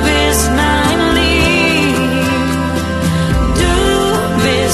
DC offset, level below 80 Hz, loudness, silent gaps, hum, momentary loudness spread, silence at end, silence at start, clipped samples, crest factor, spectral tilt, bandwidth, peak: under 0.1%; -22 dBFS; -12 LUFS; none; none; 5 LU; 0 s; 0 s; under 0.1%; 12 dB; -4.5 dB/octave; 13 kHz; 0 dBFS